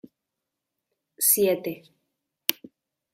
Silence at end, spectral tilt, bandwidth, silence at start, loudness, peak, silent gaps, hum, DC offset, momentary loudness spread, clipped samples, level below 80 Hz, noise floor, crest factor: 0.6 s; -2 dB/octave; 16 kHz; 1.2 s; -23 LUFS; 0 dBFS; none; none; under 0.1%; 15 LU; under 0.1%; -74 dBFS; -84 dBFS; 30 dB